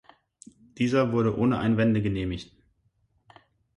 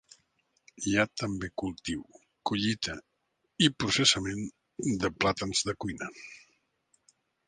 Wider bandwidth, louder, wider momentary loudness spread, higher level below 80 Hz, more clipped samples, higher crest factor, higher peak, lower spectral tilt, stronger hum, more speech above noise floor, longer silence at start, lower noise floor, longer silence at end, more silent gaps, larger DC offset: about the same, 10.5 kHz vs 10 kHz; first, -25 LUFS vs -30 LUFS; second, 8 LU vs 15 LU; first, -50 dBFS vs -56 dBFS; neither; second, 16 dB vs 24 dB; second, -12 dBFS vs -8 dBFS; first, -7.5 dB/octave vs -3.5 dB/octave; neither; about the same, 45 dB vs 48 dB; about the same, 0.8 s vs 0.8 s; second, -69 dBFS vs -78 dBFS; first, 1.35 s vs 1.1 s; neither; neither